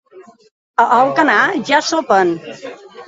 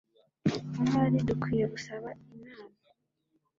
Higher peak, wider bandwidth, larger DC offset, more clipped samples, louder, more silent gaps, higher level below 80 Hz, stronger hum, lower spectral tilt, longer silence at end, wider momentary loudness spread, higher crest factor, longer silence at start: first, 0 dBFS vs -14 dBFS; about the same, 8 kHz vs 7.6 kHz; neither; neither; first, -14 LUFS vs -30 LUFS; first, 0.51-0.74 s vs none; about the same, -62 dBFS vs -58 dBFS; neither; second, -3.5 dB/octave vs -7.5 dB/octave; second, 0.05 s vs 0.9 s; second, 18 LU vs 23 LU; about the same, 16 dB vs 18 dB; second, 0.15 s vs 0.45 s